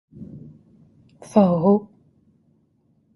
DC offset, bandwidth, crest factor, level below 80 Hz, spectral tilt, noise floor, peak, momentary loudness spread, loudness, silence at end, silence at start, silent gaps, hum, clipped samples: under 0.1%; 11.5 kHz; 22 dB; -60 dBFS; -9.5 dB/octave; -63 dBFS; -2 dBFS; 24 LU; -19 LUFS; 1.3 s; 0.2 s; none; none; under 0.1%